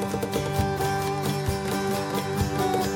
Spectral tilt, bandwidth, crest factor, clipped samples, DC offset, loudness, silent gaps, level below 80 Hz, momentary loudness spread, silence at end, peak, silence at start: -5.5 dB/octave; 17 kHz; 14 dB; under 0.1%; under 0.1%; -26 LUFS; none; -42 dBFS; 2 LU; 0 s; -12 dBFS; 0 s